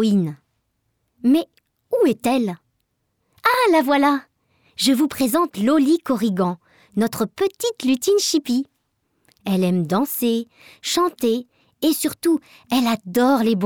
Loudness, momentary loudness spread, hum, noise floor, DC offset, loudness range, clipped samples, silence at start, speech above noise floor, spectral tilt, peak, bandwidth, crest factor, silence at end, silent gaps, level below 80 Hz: -20 LUFS; 9 LU; none; -71 dBFS; under 0.1%; 3 LU; under 0.1%; 0 s; 52 dB; -4.5 dB/octave; -6 dBFS; over 20 kHz; 16 dB; 0 s; none; -64 dBFS